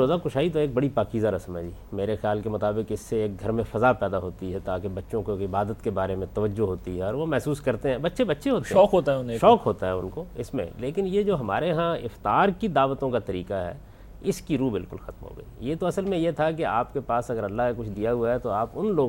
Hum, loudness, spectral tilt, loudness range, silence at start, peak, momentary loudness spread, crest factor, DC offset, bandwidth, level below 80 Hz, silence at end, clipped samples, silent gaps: none; -26 LUFS; -7 dB/octave; 5 LU; 0 s; -4 dBFS; 10 LU; 20 dB; under 0.1%; 16.5 kHz; -46 dBFS; 0 s; under 0.1%; none